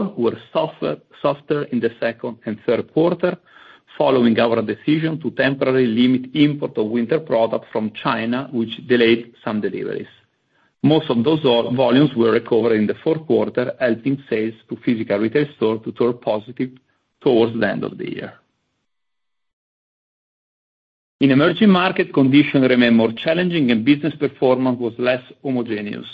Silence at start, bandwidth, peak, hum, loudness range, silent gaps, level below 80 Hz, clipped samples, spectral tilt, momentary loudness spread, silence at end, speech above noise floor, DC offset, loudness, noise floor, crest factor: 0 s; 5.2 kHz; -2 dBFS; none; 7 LU; 19.53-21.19 s; -60 dBFS; under 0.1%; -9 dB/octave; 11 LU; 0 s; 65 dB; under 0.1%; -19 LUFS; -83 dBFS; 18 dB